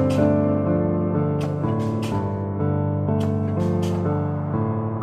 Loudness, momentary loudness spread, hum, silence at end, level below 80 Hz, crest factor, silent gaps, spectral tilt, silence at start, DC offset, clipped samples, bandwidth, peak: -23 LUFS; 5 LU; none; 0 s; -48 dBFS; 16 dB; none; -9 dB/octave; 0 s; under 0.1%; under 0.1%; 10 kHz; -6 dBFS